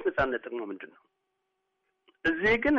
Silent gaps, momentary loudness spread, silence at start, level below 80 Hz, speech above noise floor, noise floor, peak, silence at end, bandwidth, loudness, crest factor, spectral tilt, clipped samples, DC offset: none; 18 LU; 0 s; -52 dBFS; 52 dB; -80 dBFS; -14 dBFS; 0 s; 7.4 kHz; -29 LUFS; 16 dB; -3 dB/octave; under 0.1%; under 0.1%